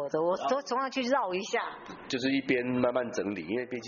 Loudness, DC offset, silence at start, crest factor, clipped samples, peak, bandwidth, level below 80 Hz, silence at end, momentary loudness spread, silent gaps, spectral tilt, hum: -30 LUFS; under 0.1%; 0 s; 18 dB; under 0.1%; -12 dBFS; 7.2 kHz; -68 dBFS; 0 s; 6 LU; none; -3.5 dB/octave; none